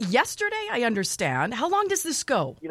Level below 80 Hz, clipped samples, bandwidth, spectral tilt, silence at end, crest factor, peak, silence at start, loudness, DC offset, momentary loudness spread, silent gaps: -62 dBFS; under 0.1%; 16 kHz; -3 dB/octave; 0 s; 18 dB; -8 dBFS; 0 s; -25 LUFS; under 0.1%; 3 LU; none